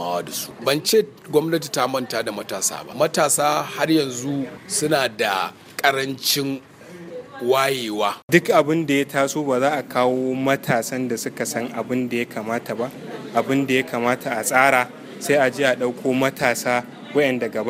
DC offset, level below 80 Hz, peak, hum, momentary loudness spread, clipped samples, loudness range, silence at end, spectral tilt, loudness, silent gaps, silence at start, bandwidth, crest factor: under 0.1%; -66 dBFS; 0 dBFS; none; 9 LU; under 0.1%; 4 LU; 0 s; -3.5 dB/octave; -21 LUFS; 8.23-8.28 s; 0 s; 16 kHz; 20 dB